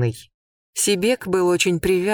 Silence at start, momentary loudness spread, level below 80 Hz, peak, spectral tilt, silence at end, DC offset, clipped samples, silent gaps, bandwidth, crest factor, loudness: 0 s; 10 LU; -48 dBFS; -6 dBFS; -4 dB/octave; 0 s; under 0.1%; under 0.1%; 0.34-0.73 s; 19.5 kHz; 16 dB; -20 LUFS